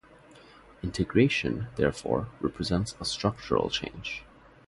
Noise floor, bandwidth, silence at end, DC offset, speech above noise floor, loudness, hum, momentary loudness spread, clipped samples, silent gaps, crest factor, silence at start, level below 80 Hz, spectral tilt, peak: -54 dBFS; 11.5 kHz; 0.45 s; under 0.1%; 25 dB; -29 LUFS; none; 12 LU; under 0.1%; none; 22 dB; 0.3 s; -48 dBFS; -5.5 dB/octave; -8 dBFS